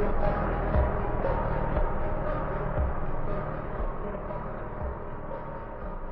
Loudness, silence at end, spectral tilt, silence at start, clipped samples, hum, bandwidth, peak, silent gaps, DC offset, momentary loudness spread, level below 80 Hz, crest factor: -32 LUFS; 0 s; -7.5 dB/octave; 0 s; under 0.1%; none; 4.2 kHz; -12 dBFS; none; under 0.1%; 10 LU; -32 dBFS; 16 dB